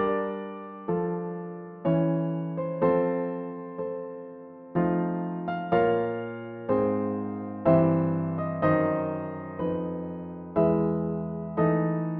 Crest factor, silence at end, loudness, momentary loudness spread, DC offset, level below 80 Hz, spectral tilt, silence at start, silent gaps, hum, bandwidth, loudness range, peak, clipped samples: 20 dB; 0 s; -28 LUFS; 13 LU; under 0.1%; -60 dBFS; -8.5 dB/octave; 0 s; none; none; 3.9 kHz; 3 LU; -8 dBFS; under 0.1%